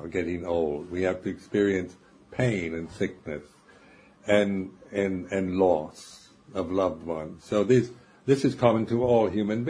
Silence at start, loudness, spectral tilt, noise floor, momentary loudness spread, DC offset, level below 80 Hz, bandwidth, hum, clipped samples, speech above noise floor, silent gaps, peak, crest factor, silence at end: 0 s; -27 LUFS; -7 dB/octave; -55 dBFS; 15 LU; under 0.1%; -56 dBFS; 11 kHz; none; under 0.1%; 28 dB; none; -6 dBFS; 20 dB; 0 s